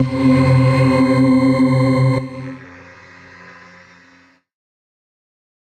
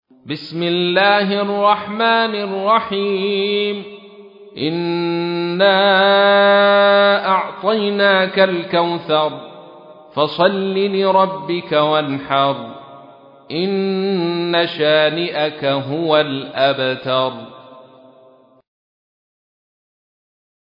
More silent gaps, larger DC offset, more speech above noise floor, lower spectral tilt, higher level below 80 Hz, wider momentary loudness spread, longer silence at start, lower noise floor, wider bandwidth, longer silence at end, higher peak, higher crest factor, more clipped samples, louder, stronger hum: neither; neither; first, 38 dB vs 33 dB; about the same, -8 dB/octave vs -8 dB/octave; first, -50 dBFS vs -66 dBFS; first, 17 LU vs 11 LU; second, 0 s vs 0.25 s; about the same, -51 dBFS vs -49 dBFS; first, 9.2 kHz vs 5.4 kHz; first, 3.05 s vs 2.9 s; second, -4 dBFS vs 0 dBFS; about the same, 14 dB vs 16 dB; neither; about the same, -14 LUFS vs -16 LUFS; neither